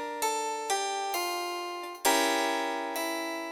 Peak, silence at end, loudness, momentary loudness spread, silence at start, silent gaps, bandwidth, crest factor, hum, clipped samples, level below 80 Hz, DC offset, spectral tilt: -12 dBFS; 0 s; -30 LUFS; 8 LU; 0 s; none; 17.5 kHz; 18 dB; none; under 0.1%; -74 dBFS; under 0.1%; 0.5 dB/octave